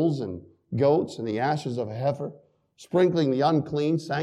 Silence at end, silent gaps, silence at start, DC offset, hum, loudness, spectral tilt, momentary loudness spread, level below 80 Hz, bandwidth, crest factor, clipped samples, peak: 0 s; none; 0 s; under 0.1%; none; -26 LUFS; -7.5 dB/octave; 12 LU; -66 dBFS; 11 kHz; 16 dB; under 0.1%; -10 dBFS